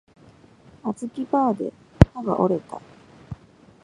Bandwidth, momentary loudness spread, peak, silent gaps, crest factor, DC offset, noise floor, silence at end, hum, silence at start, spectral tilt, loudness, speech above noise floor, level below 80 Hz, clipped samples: 11 kHz; 23 LU; 0 dBFS; none; 24 dB; under 0.1%; -51 dBFS; 0.5 s; none; 0.85 s; -8.5 dB/octave; -23 LUFS; 27 dB; -36 dBFS; under 0.1%